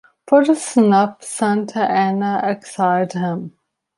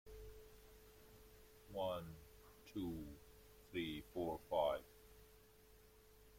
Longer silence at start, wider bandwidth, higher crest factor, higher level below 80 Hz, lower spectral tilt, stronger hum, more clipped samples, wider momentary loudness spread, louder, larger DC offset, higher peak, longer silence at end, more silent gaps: first, 0.25 s vs 0.05 s; second, 11.5 kHz vs 16.5 kHz; second, 16 dB vs 22 dB; about the same, -66 dBFS vs -66 dBFS; about the same, -6 dB/octave vs -5.5 dB/octave; neither; neither; second, 9 LU vs 25 LU; first, -17 LUFS vs -46 LUFS; neither; first, -2 dBFS vs -26 dBFS; first, 0.5 s vs 0 s; neither